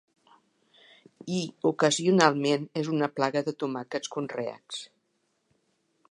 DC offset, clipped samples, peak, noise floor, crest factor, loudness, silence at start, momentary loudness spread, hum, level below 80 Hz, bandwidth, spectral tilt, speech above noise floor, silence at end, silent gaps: under 0.1%; under 0.1%; -4 dBFS; -75 dBFS; 26 dB; -27 LUFS; 1.25 s; 14 LU; none; -78 dBFS; 11.5 kHz; -4.5 dB/octave; 48 dB; 1.25 s; none